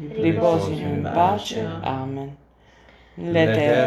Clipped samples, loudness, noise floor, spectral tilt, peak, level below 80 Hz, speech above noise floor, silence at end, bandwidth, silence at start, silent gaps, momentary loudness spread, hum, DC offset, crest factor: under 0.1%; -22 LUFS; -52 dBFS; -6.5 dB/octave; -4 dBFS; -54 dBFS; 31 dB; 0 s; 13 kHz; 0 s; none; 13 LU; none; under 0.1%; 18 dB